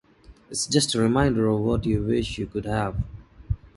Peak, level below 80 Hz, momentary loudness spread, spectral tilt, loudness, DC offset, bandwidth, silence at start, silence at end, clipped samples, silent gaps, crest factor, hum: -6 dBFS; -38 dBFS; 12 LU; -5 dB/octave; -24 LUFS; under 0.1%; 11.5 kHz; 0.3 s; 0.1 s; under 0.1%; none; 18 dB; none